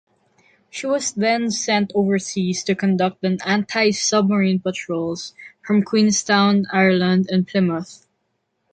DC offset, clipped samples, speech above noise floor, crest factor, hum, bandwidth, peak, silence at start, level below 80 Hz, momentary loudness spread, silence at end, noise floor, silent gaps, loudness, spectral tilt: under 0.1%; under 0.1%; 53 dB; 16 dB; none; 9.4 kHz; -4 dBFS; 0.75 s; -62 dBFS; 10 LU; 0.8 s; -72 dBFS; none; -19 LUFS; -4.5 dB/octave